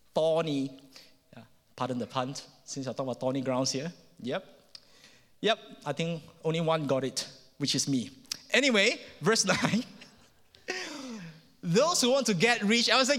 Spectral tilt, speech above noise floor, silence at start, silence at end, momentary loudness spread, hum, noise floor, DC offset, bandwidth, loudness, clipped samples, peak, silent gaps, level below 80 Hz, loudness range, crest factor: -3.5 dB/octave; 31 dB; 0.15 s; 0 s; 17 LU; none; -59 dBFS; under 0.1%; 16.5 kHz; -29 LUFS; under 0.1%; -8 dBFS; none; -72 dBFS; 7 LU; 22 dB